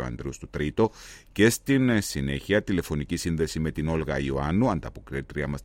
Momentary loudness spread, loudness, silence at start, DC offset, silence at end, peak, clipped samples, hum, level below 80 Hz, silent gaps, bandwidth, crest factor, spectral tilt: 12 LU; -26 LUFS; 0 s; under 0.1%; 0 s; -6 dBFS; under 0.1%; none; -42 dBFS; none; 16.5 kHz; 20 dB; -5.5 dB/octave